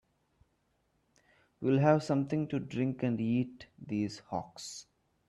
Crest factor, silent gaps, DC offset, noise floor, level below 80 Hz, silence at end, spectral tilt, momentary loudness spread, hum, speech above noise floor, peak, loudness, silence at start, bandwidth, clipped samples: 20 dB; none; under 0.1%; -76 dBFS; -70 dBFS; 0.45 s; -7 dB/octave; 17 LU; none; 44 dB; -14 dBFS; -32 LUFS; 1.6 s; 12 kHz; under 0.1%